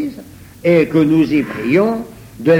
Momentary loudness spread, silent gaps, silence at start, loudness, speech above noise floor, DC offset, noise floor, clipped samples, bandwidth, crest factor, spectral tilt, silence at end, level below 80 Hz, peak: 13 LU; none; 0 s; -15 LUFS; 23 dB; under 0.1%; -36 dBFS; under 0.1%; 16 kHz; 14 dB; -8 dB/octave; 0 s; -46 dBFS; 0 dBFS